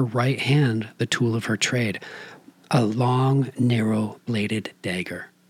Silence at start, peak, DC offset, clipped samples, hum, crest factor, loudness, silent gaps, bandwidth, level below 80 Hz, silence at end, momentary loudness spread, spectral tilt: 0 s; -8 dBFS; under 0.1%; under 0.1%; none; 16 dB; -23 LUFS; none; 14.5 kHz; -74 dBFS; 0.25 s; 9 LU; -5.5 dB/octave